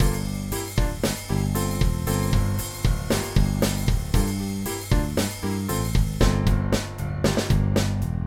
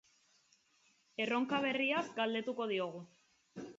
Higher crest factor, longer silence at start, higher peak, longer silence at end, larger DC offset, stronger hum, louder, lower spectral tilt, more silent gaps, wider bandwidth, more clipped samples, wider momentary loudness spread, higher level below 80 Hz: about the same, 18 dB vs 18 dB; second, 0 s vs 1.2 s; first, -4 dBFS vs -22 dBFS; about the same, 0 s vs 0 s; neither; neither; first, -25 LUFS vs -36 LUFS; first, -5.5 dB/octave vs -2 dB/octave; neither; first, 18 kHz vs 7.6 kHz; neither; second, 5 LU vs 17 LU; first, -28 dBFS vs -84 dBFS